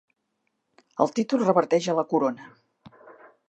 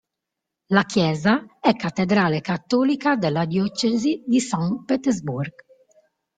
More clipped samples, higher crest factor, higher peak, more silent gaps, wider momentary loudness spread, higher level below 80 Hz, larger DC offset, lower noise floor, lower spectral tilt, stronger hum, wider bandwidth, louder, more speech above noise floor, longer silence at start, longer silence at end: neither; about the same, 22 dB vs 20 dB; about the same, -4 dBFS vs -2 dBFS; neither; first, 10 LU vs 5 LU; second, -78 dBFS vs -60 dBFS; neither; second, -77 dBFS vs -83 dBFS; about the same, -6 dB/octave vs -5.5 dB/octave; neither; about the same, 8.6 kHz vs 9.4 kHz; about the same, -24 LUFS vs -22 LUFS; second, 53 dB vs 62 dB; first, 0.95 s vs 0.7 s; second, 0.4 s vs 0.9 s